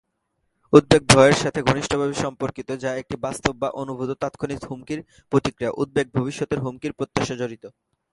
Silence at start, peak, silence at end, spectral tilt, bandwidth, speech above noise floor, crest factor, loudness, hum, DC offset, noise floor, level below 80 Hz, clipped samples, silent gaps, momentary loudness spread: 0.7 s; 0 dBFS; 0.45 s; -5 dB/octave; 11.5 kHz; 52 dB; 22 dB; -22 LUFS; none; under 0.1%; -74 dBFS; -48 dBFS; under 0.1%; none; 15 LU